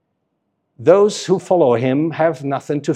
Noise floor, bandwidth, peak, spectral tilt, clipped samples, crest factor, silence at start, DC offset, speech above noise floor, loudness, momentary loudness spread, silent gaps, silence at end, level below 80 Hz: -71 dBFS; 11 kHz; 0 dBFS; -6 dB/octave; under 0.1%; 16 dB; 0.8 s; under 0.1%; 55 dB; -16 LUFS; 8 LU; none; 0 s; -70 dBFS